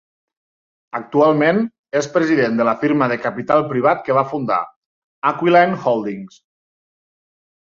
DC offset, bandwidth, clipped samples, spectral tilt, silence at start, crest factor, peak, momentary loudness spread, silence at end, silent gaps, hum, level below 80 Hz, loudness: under 0.1%; 7.4 kHz; under 0.1%; -6.5 dB/octave; 0.95 s; 18 dB; -2 dBFS; 9 LU; 1.4 s; 1.79-1.84 s, 4.76-5.22 s; none; -62 dBFS; -17 LUFS